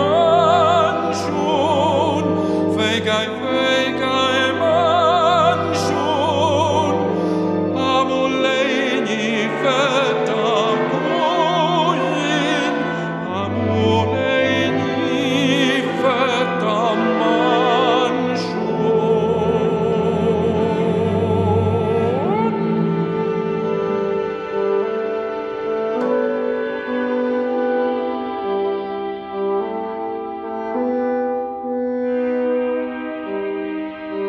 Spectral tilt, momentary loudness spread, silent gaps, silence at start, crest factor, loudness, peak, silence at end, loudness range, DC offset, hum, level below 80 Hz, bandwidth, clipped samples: -5.5 dB/octave; 8 LU; none; 0 s; 16 dB; -18 LUFS; -2 dBFS; 0 s; 5 LU; under 0.1%; none; -54 dBFS; 12 kHz; under 0.1%